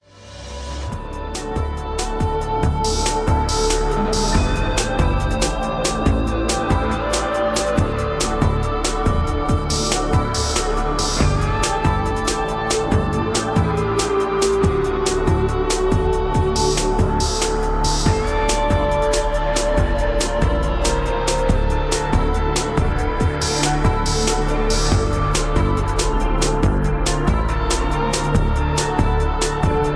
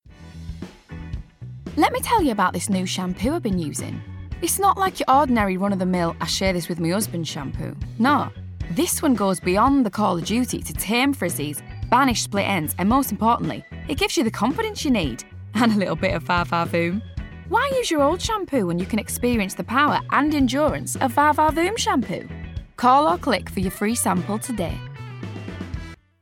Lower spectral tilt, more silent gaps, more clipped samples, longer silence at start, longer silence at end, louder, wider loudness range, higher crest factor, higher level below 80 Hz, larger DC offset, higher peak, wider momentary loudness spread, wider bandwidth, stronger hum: about the same, -4.5 dB/octave vs -4.5 dB/octave; neither; neither; about the same, 0.15 s vs 0.05 s; second, 0 s vs 0.25 s; about the same, -20 LUFS vs -21 LUFS; about the same, 1 LU vs 3 LU; about the same, 16 dB vs 18 dB; first, -22 dBFS vs -40 dBFS; neither; about the same, -2 dBFS vs -4 dBFS; second, 3 LU vs 16 LU; second, 11 kHz vs 17.5 kHz; neither